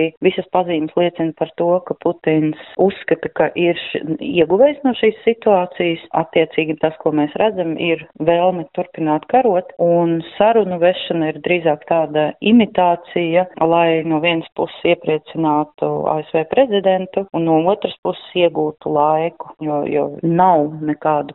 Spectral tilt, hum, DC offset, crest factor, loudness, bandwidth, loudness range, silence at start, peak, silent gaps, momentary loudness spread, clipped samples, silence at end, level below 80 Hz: -4.5 dB/octave; none; under 0.1%; 16 dB; -17 LUFS; 4 kHz; 2 LU; 0 s; -2 dBFS; 0.17-0.21 s, 17.98-18.03 s; 7 LU; under 0.1%; 0 s; -58 dBFS